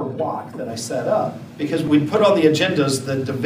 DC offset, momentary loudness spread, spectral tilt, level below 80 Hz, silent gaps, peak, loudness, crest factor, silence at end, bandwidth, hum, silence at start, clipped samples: under 0.1%; 13 LU; -5.5 dB/octave; -64 dBFS; none; -2 dBFS; -20 LUFS; 18 dB; 0 s; 15.5 kHz; none; 0 s; under 0.1%